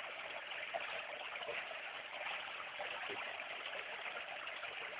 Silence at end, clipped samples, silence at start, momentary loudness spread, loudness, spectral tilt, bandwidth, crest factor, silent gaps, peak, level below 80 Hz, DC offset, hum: 0 s; under 0.1%; 0 s; 3 LU; -44 LUFS; 2.5 dB/octave; 4 kHz; 18 dB; none; -26 dBFS; -84 dBFS; under 0.1%; none